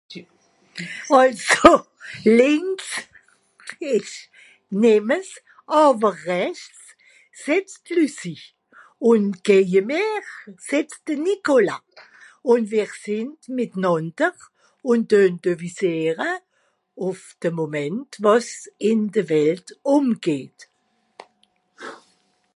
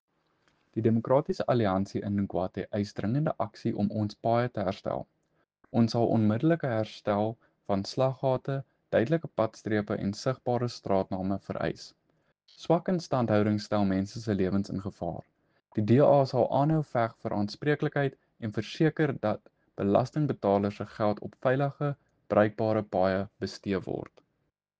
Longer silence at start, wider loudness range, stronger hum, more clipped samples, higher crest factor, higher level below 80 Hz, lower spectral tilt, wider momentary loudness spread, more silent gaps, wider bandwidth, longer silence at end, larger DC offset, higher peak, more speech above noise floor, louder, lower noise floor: second, 0.1 s vs 0.75 s; first, 6 LU vs 3 LU; neither; neither; about the same, 22 dB vs 20 dB; first, -56 dBFS vs -64 dBFS; second, -5 dB/octave vs -7.5 dB/octave; first, 19 LU vs 10 LU; neither; first, 11.5 kHz vs 8.6 kHz; second, 0.6 s vs 0.75 s; neither; first, 0 dBFS vs -8 dBFS; about the same, 48 dB vs 51 dB; first, -20 LUFS vs -29 LUFS; second, -68 dBFS vs -79 dBFS